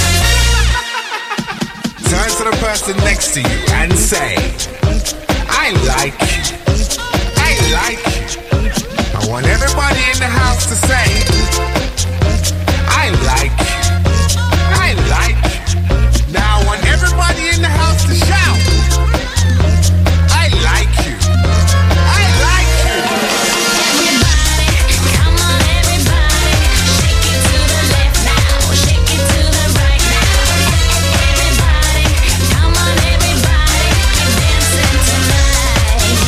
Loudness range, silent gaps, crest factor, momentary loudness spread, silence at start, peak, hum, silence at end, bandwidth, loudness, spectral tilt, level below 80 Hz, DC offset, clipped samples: 3 LU; none; 12 dB; 5 LU; 0 s; 0 dBFS; none; 0 s; 16 kHz; -12 LUFS; -3.5 dB/octave; -16 dBFS; under 0.1%; under 0.1%